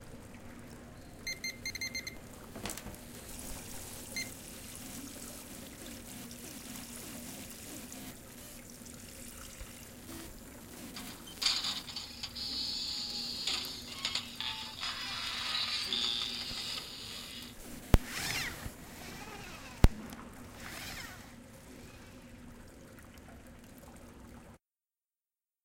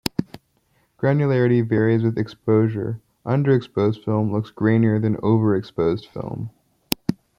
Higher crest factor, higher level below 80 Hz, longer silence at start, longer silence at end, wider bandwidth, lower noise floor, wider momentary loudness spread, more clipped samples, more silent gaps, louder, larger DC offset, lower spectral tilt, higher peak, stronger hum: first, 34 dB vs 20 dB; first, -46 dBFS vs -56 dBFS; about the same, 0 s vs 0.05 s; first, 1.05 s vs 0.25 s; about the same, 17 kHz vs 16.5 kHz; first, under -90 dBFS vs -64 dBFS; first, 21 LU vs 12 LU; neither; neither; second, -38 LUFS vs -21 LUFS; neither; second, -3 dB/octave vs -7.5 dB/octave; second, -6 dBFS vs 0 dBFS; neither